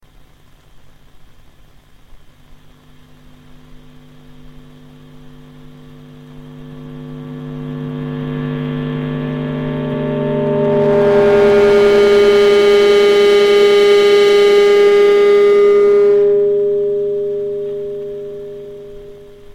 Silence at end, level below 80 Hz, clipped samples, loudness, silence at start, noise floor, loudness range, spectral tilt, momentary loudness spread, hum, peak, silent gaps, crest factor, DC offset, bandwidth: 0.3 s; -44 dBFS; under 0.1%; -12 LUFS; 0.75 s; -44 dBFS; 16 LU; -5.5 dB/octave; 20 LU; none; -2 dBFS; none; 12 dB; under 0.1%; 11 kHz